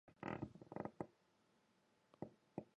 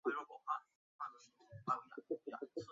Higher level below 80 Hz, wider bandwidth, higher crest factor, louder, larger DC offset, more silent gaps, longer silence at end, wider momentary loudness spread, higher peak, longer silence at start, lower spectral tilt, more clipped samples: first, -76 dBFS vs -84 dBFS; first, 9.6 kHz vs 7.4 kHz; about the same, 24 dB vs 22 dB; second, -53 LUFS vs -46 LUFS; neither; second, none vs 0.75-0.99 s; about the same, 0.1 s vs 0 s; about the same, 8 LU vs 8 LU; second, -32 dBFS vs -24 dBFS; about the same, 0.05 s vs 0.05 s; first, -8 dB/octave vs -4.5 dB/octave; neither